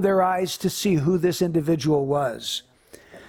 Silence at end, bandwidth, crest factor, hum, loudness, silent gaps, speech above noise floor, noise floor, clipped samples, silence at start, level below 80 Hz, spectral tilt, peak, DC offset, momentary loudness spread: 0 s; 19 kHz; 14 dB; none; -23 LUFS; none; 26 dB; -48 dBFS; under 0.1%; 0 s; -56 dBFS; -5.5 dB/octave; -8 dBFS; under 0.1%; 7 LU